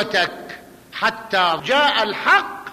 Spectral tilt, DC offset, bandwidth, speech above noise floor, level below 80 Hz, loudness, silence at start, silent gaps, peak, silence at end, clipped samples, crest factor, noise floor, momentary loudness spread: -2.5 dB/octave; under 0.1%; 15 kHz; 20 dB; -60 dBFS; -18 LUFS; 0 s; none; -6 dBFS; 0 s; under 0.1%; 14 dB; -39 dBFS; 19 LU